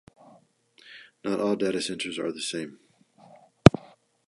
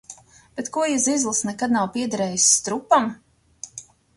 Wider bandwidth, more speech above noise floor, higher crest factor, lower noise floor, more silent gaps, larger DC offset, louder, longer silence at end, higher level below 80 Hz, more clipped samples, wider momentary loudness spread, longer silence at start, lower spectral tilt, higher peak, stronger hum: about the same, 11.5 kHz vs 11.5 kHz; first, 31 dB vs 25 dB; first, 28 dB vs 20 dB; first, -60 dBFS vs -46 dBFS; neither; neither; second, -25 LUFS vs -20 LUFS; first, 0.6 s vs 0.35 s; first, -48 dBFS vs -62 dBFS; neither; about the same, 22 LU vs 21 LU; first, 0.9 s vs 0.1 s; first, -6 dB/octave vs -2.5 dB/octave; first, 0 dBFS vs -4 dBFS; neither